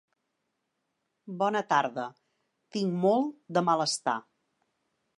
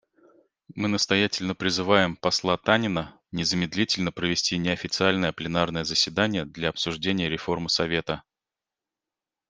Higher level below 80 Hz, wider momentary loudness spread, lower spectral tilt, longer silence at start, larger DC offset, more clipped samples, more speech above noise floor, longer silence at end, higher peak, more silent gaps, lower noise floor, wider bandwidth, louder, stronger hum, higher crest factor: second, -84 dBFS vs -56 dBFS; first, 12 LU vs 6 LU; about the same, -4.5 dB/octave vs -4 dB/octave; first, 1.25 s vs 0.75 s; neither; neither; second, 53 dB vs 64 dB; second, 1 s vs 1.3 s; second, -10 dBFS vs -2 dBFS; neither; second, -81 dBFS vs -89 dBFS; first, 11.5 kHz vs 10 kHz; second, -29 LUFS vs -25 LUFS; neither; about the same, 20 dB vs 24 dB